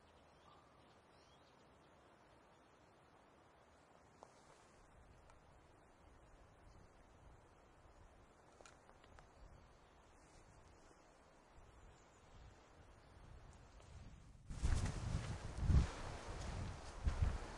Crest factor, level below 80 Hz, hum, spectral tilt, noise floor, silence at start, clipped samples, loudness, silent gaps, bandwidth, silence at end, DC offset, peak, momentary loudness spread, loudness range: 26 dB; -52 dBFS; none; -6 dB/octave; -68 dBFS; 0.45 s; under 0.1%; -44 LUFS; none; 11.5 kHz; 0 s; under 0.1%; -22 dBFS; 24 LU; 23 LU